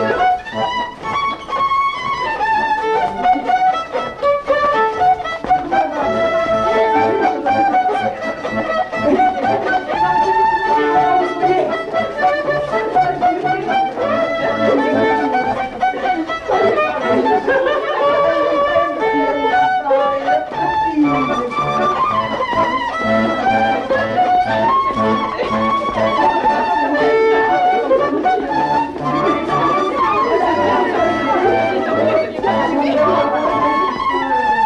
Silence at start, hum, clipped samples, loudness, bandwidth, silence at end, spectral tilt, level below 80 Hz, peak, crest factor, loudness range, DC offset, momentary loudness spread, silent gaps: 0 s; none; under 0.1%; -16 LUFS; 10 kHz; 0 s; -5.5 dB/octave; -44 dBFS; -4 dBFS; 12 dB; 2 LU; under 0.1%; 4 LU; none